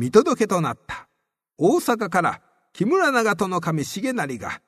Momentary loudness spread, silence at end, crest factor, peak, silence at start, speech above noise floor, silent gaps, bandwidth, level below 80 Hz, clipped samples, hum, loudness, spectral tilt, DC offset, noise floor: 11 LU; 0.1 s; 22 dB; 0 dBFS; 0 s; 55 dB; none; 13.5 kHz; -60 dBFS; under 0.1%; none; -22 LUFS; -5.5 dB/octave; under 0.1%; -76 dBFS